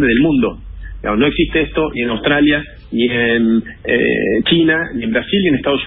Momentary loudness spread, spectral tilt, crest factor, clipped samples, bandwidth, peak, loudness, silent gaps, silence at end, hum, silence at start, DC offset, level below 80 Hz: 7 LU; -11 dB/octave; 14 dB; under 0.1%; 4 kHz; -2 dBFS; -15 LUFS; none; 0 s; none; 0 s; under 0.1%; -34 dBFS